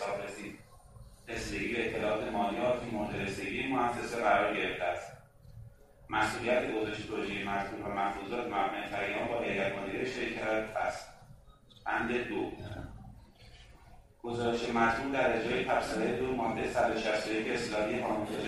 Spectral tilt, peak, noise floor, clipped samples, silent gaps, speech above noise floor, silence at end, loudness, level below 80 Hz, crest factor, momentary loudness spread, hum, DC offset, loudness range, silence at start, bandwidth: -5 dB/octave; -14 dBFS; -57 dBFS; under 0.1%; none; 25 dB; 0 s; -33 LUFS; -56 dBFS; 20 dB; 13 LU; none; under 0.1%; 5 LU; 0 s; 13.5 kHz